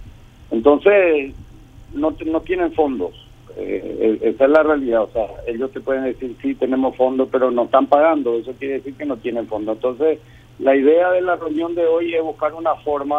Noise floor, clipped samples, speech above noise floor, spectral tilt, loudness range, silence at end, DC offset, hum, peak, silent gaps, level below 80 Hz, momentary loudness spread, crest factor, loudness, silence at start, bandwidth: -41 dBFS; under 0.1%; 23 dB; -7.5 dB/octave; 1 LU; 0 s; under 0.1%; none; 0 dBFS; none; -46 dBFS; 12 LU; 18 dB; -18 LUFS; 0 s; 6.8 kHz